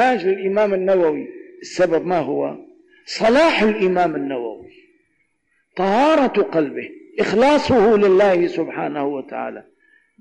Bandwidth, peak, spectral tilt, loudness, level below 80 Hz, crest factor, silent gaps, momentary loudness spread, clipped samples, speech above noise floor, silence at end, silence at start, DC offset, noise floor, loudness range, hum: 9.8 kHz; -10 dBFS; -5.5 dB/octave; -18 LUFS; -52 dBFS; 8 dB; none; 16 LU; under 0.1%; 50 dB; 0.6 s; 0 s; under 0.1%; -67 dBFS; 4 LU; none